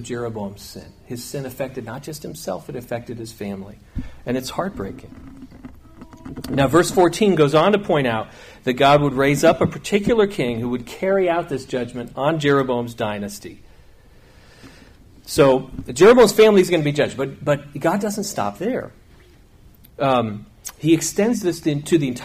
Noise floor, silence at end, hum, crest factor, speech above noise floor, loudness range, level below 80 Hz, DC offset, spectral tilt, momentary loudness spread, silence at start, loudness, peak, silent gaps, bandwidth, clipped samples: -49 dBFS; 0 s; none; 18 dB; 29 dB; 13 LU; -46 dBFS; under 0.1%; -5.5 dB/octave; 18 LU; 0 s; -19 LUFS; -2 dBFS; none; 15.5 kHz; under 0.1%